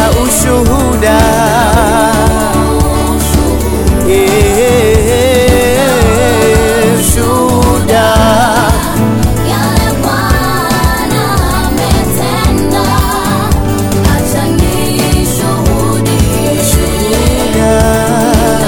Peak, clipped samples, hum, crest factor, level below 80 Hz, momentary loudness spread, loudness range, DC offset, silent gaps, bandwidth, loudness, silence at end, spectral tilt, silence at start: 0 dBFS; under 0.1%; none; 8 dB; -16 dBFS; 4 LU; 3 LU; 2%; none; 18.5 kHz; -9 LUFS; 0 s; -5 dB/octave; 0 s